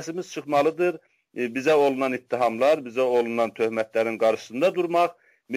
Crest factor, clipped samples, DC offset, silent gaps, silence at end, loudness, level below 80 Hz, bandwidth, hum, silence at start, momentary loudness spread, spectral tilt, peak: 14 dB; under 0.1%; under 0.1%; none; 0 s; -24 LUFS; -72 dBFS; 16 kHz; none; 0 s; 9 LU; -5 dB/octave; -10 dBFS